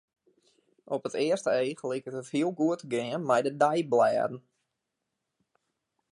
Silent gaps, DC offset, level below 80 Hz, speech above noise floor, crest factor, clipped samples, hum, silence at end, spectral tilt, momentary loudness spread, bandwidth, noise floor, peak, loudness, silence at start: none; under 0.1%; -80 dBFS; 56 dB; 20 dB; under 0.1%; none; 1.7 s; -5.5 dB/octave; 10 LU; 11.5 kHz; -84 dBFS; -10 dBFS; -29 LUFS; 0.9 s